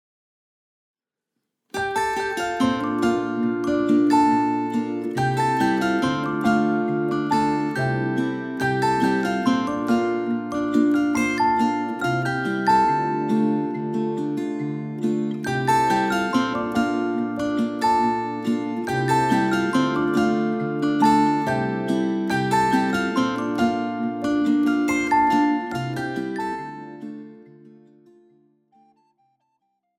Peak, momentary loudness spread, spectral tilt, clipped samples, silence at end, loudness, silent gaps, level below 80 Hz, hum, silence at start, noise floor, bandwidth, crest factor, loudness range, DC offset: -4 dBFS; 7 LU; -6 dB/octave; under 0.1%; 2.3 s; -22 LUFS; none; -56 dBFS; none; 1.75 s; -82 dBFS; 15.5 kHz; 18 dB; 4 LU; under 0.1%